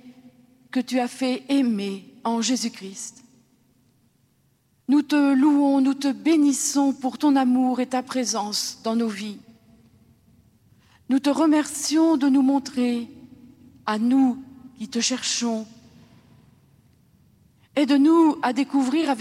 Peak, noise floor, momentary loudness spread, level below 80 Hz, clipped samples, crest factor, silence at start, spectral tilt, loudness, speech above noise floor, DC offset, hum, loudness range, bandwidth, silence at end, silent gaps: -8 dBFS; -64 dBFS; 14 LU; -72 dBFS; under 0.1%; 16 dB; 0.05 s; -3.5 dB/octave; -22 LUFS; 43 dB; under 0.1%; none; 7 LU; 14 kHz; 0 s; none